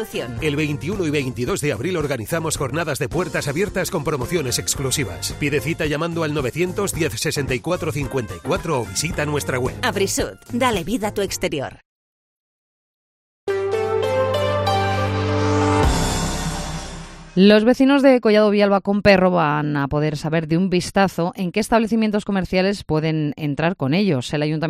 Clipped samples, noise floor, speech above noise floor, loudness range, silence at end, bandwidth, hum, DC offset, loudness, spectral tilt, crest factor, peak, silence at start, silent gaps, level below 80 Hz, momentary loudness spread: under 0.1%; under -90 dBFS; over 70 dB; 7 LU; 0 s; 15.5 kHz; none; under 0.1%; -20 LUFS; -5 dB/octave; 20 dB; 0 dBFS; 0 s; 11.85-13.47 s; -38 dBFS; 9 LU